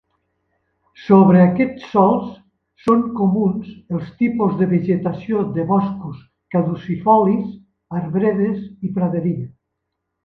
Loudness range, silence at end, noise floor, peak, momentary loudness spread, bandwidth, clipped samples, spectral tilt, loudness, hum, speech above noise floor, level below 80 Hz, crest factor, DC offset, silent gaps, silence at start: 4 LU; 0.75 s; -77 dBFS; 0 dBFS; 15 LU; 4.5 kHz; under 0.1%; -10.5 dB/octave; -18 LUFS; none; 60 dB; -54 dBFS; 18 dB; under 0.1%; none; 1 s